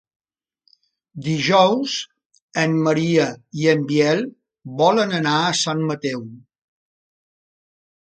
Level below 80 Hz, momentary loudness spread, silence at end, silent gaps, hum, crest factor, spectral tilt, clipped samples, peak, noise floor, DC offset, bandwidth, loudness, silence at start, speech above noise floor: -66 dBFS; 14 LU; 1.75 s; 2.26-2.30 s, 2.42-2.48 s; none; 20 dB; -5 dB/octave; under 0.1%; -2 dBFS; -67 dBFS; under 0.1%; 9.2 kHz; -19 LUFS; 1.15 s; 48 dB